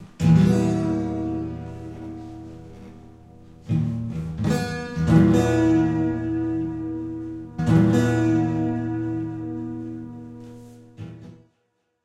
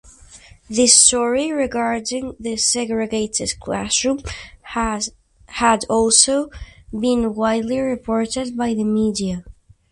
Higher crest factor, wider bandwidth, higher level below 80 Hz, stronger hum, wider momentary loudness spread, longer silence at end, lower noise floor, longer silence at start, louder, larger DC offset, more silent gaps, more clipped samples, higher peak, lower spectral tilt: about the same, 18 dB vs 20 dB; about the same, 12 kHz vs 11.5 kHz; about the same, -44 dBFS vs -44 dBFS; neither; first, 22 LU vs 14 LU; first, 0.7 s vs 0.4 s; first, -72 dBFS vs -45 dBFS; about the same, 0 s vs 0.05 s; second, -22 LUFS vs -18 LUFS; neither; neither; neither; second, -4 dBFS vs 0 dBFS; first, -8 dB/octave vs -2.5 dB/octave